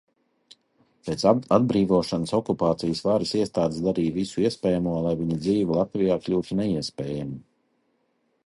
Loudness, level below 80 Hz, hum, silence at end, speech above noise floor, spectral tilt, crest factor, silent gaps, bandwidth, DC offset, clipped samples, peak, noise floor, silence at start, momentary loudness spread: -24 LUFS; -54 dBFS; none; 1.05 s; 47 dB; -7 dB/octave; 20 dB; none; 11.5 kHz; under 0.1%; under 0.1%; -4 dBFS; -70 dBFS; 1.05 s; 10 LU